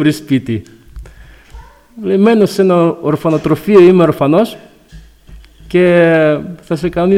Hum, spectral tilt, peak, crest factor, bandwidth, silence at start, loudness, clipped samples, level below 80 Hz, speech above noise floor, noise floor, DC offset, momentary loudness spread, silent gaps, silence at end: none; -7.5 dB/octave; 0 dBFS; 12 dB; 15.5 kHz; 0 s; -11 LUFS; under 0.1%; -40 dBFS; 28 dB; -38 dBFS; under 0.1%; 12 LU; none; 0 s